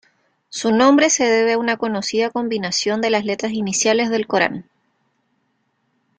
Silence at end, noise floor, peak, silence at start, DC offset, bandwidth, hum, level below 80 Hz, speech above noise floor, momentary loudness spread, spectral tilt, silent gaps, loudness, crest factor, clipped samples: 1.55 s; -68 dBFS; -2 dBFS; 0.5 s; under 0.1%; 10 kHz; none; -62 dBFS; 50 dB; 9 LU; -3 dB/octave; none; -18 LUFS; 18 dB; under 0.1%